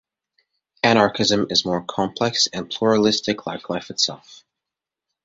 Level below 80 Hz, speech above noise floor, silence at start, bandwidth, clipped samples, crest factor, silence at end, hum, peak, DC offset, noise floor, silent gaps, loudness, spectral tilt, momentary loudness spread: -58 dBFS; 66 dB; 0.85 s; 8 kHz; under 0.1%; 20 dB; 0.9 s; none; -2 dBFS; under 0.1%; -86 dBFS; none; -20 LUFS; -3.5 dB/octave; 11 LU